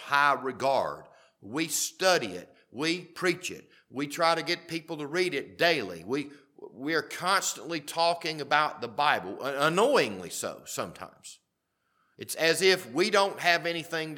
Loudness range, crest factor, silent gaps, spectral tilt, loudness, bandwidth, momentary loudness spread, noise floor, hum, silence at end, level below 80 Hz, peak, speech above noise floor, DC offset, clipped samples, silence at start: 3 LU; 24 dB; none; -2.5 dB/octave; -28 LUFS; 19 kHz; 14 LU; -79 dBFS; none; 0 s; -76 dBFS; -6 dBFS; 50 dB; under 0.1%; under 0.1%; 0 s